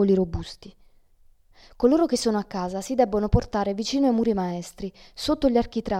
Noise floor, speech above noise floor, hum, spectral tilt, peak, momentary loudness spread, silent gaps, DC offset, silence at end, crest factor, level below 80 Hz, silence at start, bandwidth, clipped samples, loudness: -56 dBFS; 33 dB; none; -6 dB/octave; -6 dBFS; 14 LU; none; under 0.1%; 0 s; 18 dB; -40 dBFS; 0 s; 15.5 kHz; under 0.1%; -24 LUFS